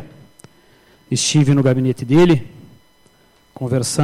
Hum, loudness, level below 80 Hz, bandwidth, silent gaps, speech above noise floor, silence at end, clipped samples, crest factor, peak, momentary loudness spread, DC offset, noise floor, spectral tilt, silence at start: none; -16 LUFS; -50 dBFS; 14.5 kHz; none; 39 dB; 0 s; under 0.1%; 14 dB; -4 dBFS; 9 LU; under 0.1%; -54 dBFS; -5.5 dB/octave; 0 s